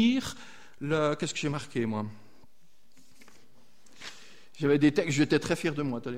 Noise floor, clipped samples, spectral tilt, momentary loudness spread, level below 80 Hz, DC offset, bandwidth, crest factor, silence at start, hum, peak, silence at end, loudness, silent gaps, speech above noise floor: -68 dBFS; under 0.1%; -5.5 dB/octave; 21 LU; -62 dBFS; 0.5%; 15 kHz; 18 dB; 0 s; none; -12 dBFS; 0 s; -29 LUFS; none; 40 dB